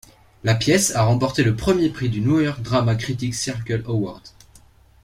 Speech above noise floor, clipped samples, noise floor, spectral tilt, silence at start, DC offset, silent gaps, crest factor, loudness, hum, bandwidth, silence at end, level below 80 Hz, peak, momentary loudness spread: 31 dB; under 0.1%; -51 dBFS; -5 dB/octave; 0.45 s; under 0.1%; none; 18 dB; -21 LUFS; none; 15.5 kHz; 0.75 s; -44 dBFS; -4 dBFS; 8 LU